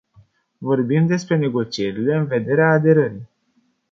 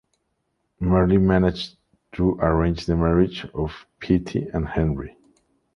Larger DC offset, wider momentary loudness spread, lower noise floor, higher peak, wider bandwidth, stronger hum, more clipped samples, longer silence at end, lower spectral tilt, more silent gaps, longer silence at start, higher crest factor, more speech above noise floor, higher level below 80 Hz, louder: neither; second, 9 LU vs 14 LU; second, -64 dBFS vs -73 dBFS; about the same, -2 dBFS vs -4 dBFS; about the same, 7.6 kHz vs 7 kHz; neither; neither; about the same, 0.65 s vs 0.65 s; about the same, -7.5 dB/octave vs -8.5 dB/octave; neither; second, 0.6 s vs 0.8 s; about the same, 18 dB vs 18 dB; second, 47 dB vs 52 dB; second, -60 dBFS vs -36 dBFS; first, -19 LUFS vs -22 LUFS